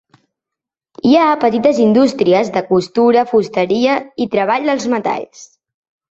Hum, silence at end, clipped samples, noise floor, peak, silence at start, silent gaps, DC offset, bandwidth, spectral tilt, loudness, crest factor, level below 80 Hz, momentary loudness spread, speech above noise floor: none; 0.65 s; under 0.1%; -84 dBFS; 0 dBFS; 1.05 s; none; under 0.1%; 8 kHz; -6 dB/octave; -14 LUFS; 14 dB; -58 dBFS; 7 LU; 71 dB